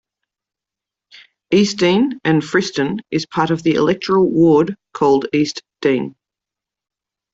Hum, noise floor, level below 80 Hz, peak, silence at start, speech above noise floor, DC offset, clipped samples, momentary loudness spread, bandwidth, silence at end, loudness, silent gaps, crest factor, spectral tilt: none; -86 dBFS; -56 dBFS; -2 dBFS; 1.5 s; 71 dB; under 0.1%; under 0.1%; 8 LU; 8 kHz; 1.25 s; -16 LUFS; none; 16 dB; -6 dB/octave